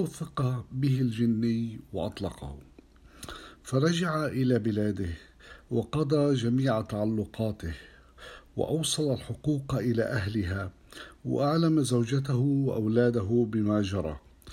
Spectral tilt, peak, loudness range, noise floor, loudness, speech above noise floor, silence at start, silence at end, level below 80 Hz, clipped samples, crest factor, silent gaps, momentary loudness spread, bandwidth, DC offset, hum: -6.5 dB/octave; -12 dBFS; 4 LU; -54 dBFS; -29 LUFS; 26 dB; 0 s; 0 s; -52 dBFS; under 0.1%; 18 dB; none; 18 LU; 14 kHz; under 0.1%; none